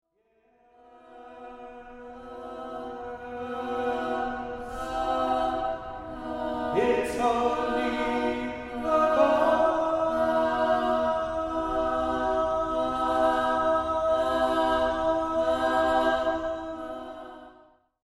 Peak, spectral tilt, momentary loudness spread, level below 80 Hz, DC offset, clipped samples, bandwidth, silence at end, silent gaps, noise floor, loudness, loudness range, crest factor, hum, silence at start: -10 dBFS; -5 dB/octave; 15 LU; -48 dBFS; under 0.1%; under 0.1%; 12 kHz; 0.55 s; none; -68 dBFS; -26 LUFS; 9 LU; 18 dB; none; 0.95 s